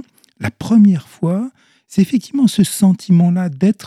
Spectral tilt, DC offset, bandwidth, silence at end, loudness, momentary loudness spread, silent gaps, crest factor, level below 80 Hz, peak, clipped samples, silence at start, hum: -6.5 dB/octave; under 0.1%; 14 kHz; 0 s; -15 LUFS; 13 LU; none; 12 dB; -54 dBFS; -2 dBFS; under 0.1%; 0.4 s; none